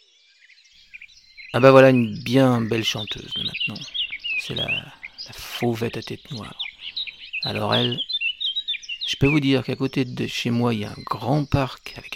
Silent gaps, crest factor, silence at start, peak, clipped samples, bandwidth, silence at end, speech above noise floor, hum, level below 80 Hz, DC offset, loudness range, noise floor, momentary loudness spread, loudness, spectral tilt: none; 20 dB; 0.95 s; -2 dBFS; under 0.1%; 16 kHz; 0 s; 35 dB; none; -50 dBFS; under 0.1%; 8 LU; -56 dBFS; 16 LU; -22 LUFS; -5.5 dB/octave